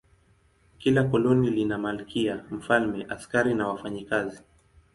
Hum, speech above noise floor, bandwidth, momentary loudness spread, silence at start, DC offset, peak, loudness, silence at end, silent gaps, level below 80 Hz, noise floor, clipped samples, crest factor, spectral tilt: none; 37 dB; 11.5 kHz; 9 LU; 0.8 s; under 0.1%; -8 dBFS; -26 LUFS; 0.55 s; none; -56 dBFS; -63 dBFS; under 0.1%; 20 dB; -6.5 dB/octave